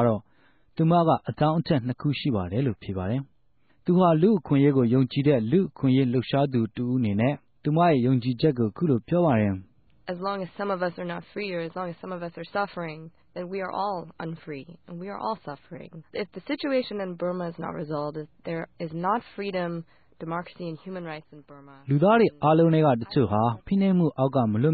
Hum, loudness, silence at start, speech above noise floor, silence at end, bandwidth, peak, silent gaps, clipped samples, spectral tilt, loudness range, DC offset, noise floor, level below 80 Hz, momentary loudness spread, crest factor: none; -25 LUFS; 0 s; 42 dB; 0 s; 4.8 kHz; -8 dBFS; none; under 0.1%; -12 dB/octave; 10 LU; under 0.1%; -67 dBFS; -54 dBFS; 16 LU; 16 dB